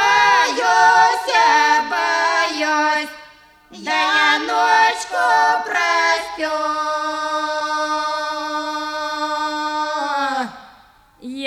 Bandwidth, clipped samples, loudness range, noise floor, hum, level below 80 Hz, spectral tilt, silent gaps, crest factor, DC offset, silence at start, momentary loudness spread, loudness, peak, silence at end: 14.5 kHz; under 0.1%; 6 LU; -49 dBFS; none; -60 dBFS; -0.5 dB/octave; none; 16 dB; under 0.1%; 0 s; 10 LU; -17 LUFS; -4 dBFS; 0 s